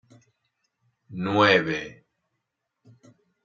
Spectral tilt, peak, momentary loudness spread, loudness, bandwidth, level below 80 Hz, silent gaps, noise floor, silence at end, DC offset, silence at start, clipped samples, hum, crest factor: -5.5 dB/octave; -4 dBFS; 23 LU; -22 LUFS; 7.4 kHz; -68 dBFS; none; -81 dBFS; 1.5 s; under 0.1%; 1.1 s; under 0.1%; none; 24 dB